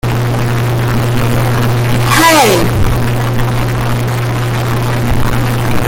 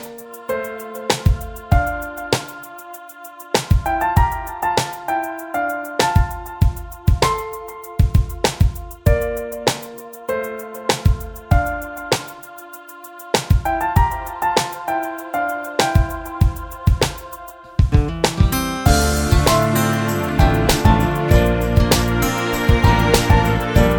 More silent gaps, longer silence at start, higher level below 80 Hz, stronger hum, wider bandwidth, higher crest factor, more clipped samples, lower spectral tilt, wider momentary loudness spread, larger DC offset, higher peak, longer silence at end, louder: neither; about the same, 0.05 s vs 0 s; about the same, -22 dBFS vs -24 dBFS; neither; second, 17 kHz vs over 20 kHz; second, 10 dB vs 18 dB; neither; about the same, -5 dB/octave vs -5 dB/octave; second, 7 LU vs 15 LU; neither; about the same, 0 dBFS vs 0 dBFS; about the same, 0 s vs 0 s; first, -12 LUFS vs -19 LUFS